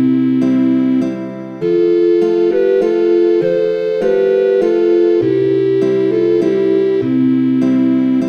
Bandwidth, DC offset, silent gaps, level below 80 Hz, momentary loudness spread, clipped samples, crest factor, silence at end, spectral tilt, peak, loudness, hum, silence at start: 6.8 kHz; under 0.1%; none; -58 dBFS; 3 LU; under 0.1%; 10 dB; 0 s; -8.5 dB/octave; -2 dBFS; -13 LUFS; none; 0 s